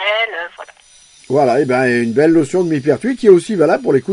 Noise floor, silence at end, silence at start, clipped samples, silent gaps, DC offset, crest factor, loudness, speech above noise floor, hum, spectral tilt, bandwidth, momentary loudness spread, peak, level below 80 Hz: -46 dBFS; 0 s; 0 s; under 0.1%; none; under 0.1%; 14 dB; -14 LUFS; 33 dB; none; -6 dB/octave; 11 kHz; 8 LU; 0 dBFS; -56 dBFS